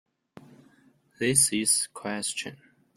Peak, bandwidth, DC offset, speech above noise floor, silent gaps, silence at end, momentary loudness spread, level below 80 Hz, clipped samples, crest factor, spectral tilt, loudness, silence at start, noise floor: -6 dBFS; 16 kHz; under 0.1%; 35 dB; none; 0.4 s; 13 LU; -66 dBFS; under 0.1%; 24 dB; -2 dB/octave; -25 LUFS; 1.2 s; -62 dBFS